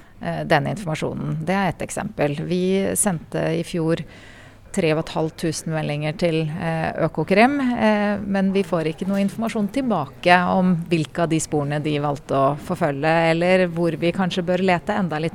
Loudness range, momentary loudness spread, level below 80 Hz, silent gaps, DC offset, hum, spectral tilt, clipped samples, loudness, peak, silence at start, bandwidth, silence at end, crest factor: 4 LU; 8 LU; -48 dBFS; none; under 0.1%; none; -5.5 dB/octave; under 0.1%; -21 LUFS; 0 dBFS; 0 s; 15 kHz; 0 s; 20 dB